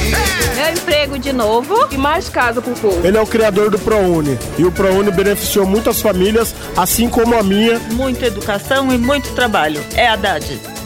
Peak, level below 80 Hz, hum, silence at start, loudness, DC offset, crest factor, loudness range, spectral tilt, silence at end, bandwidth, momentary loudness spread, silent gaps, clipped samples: -2 dBFS; -30 dBFS; none; 0 s; -14 LUFS; under 0.1%; 14 dB; 1 LU; -4 dB/octave; 0 s; 17.5 kHz; 4 LU; none; under 0.1%